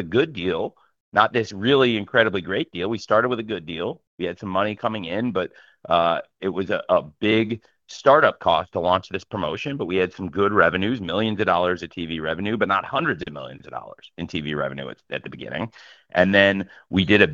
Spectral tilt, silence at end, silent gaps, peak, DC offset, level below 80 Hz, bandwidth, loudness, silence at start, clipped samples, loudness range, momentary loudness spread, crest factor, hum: -6 dB/octave; 0 s; 1.00-1.12 s, 4.07-4.18 s; 0 dBFS; under 0.1%; -56 dBFS; 7.4 kHz; -22 LUFS; 0 s; under 0.1%; 5 LU; 14 LU; 22 dB; none